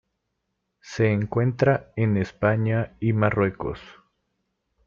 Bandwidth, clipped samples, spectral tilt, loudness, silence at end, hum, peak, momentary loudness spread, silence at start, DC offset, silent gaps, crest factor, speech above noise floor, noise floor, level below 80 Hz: 7.2 kHz; under 0.1%; -8.5 dB/octave; -24 LUFS; 0.95 s; none; -6 dBFS; 11 LU; 0.85 s; under 0.1%; none; 18 dB; 55 dB; -78 dBFS; -52 dBFS